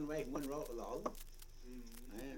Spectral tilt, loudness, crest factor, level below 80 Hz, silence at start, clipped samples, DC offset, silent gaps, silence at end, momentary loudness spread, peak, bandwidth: -5 dB/octave; -47 LUFS; 18 dB; -54 dBFS; 0 s; under 0.1%; under 0.1%; none; 0 s; 14 LU; -28 dBFS; 17 kHz